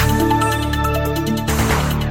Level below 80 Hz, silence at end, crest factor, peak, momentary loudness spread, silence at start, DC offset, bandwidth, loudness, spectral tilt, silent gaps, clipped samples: -26 dBFS; 0 s; 12 dB; -4 dBFS; 4 LU; 0 s; under 0.1%; 17 kHz; -18 LUFS; -5 dB/octave; none; under 0.1%